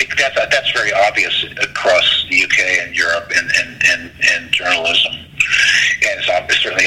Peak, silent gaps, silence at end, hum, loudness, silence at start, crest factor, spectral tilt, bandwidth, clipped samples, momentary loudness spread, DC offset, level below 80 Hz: 0 dBFS; none; 0 s; none; -13 LUFS; 0 s; 14 dB; -0.5 dB/octave; 16.5 kHz; under 0.1%; 5 LU; under 0.1%; -48 dBFS